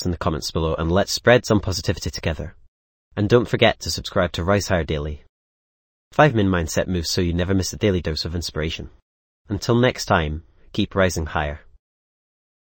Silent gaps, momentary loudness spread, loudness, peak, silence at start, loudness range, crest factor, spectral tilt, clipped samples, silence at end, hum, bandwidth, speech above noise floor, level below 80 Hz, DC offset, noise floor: 2.68-3.11 s, 5.29-6.11 s, 9.02-9.45 s; 14 LU; -21 LUFS; 0 dBFS; 0 s; 3 LU; 22 dB; -5 dB/octave; under 0.1%; 1.05 s; none; 17 kHz; over 69 dB; -38 dBFS; under 0.1%; under -90 dBFS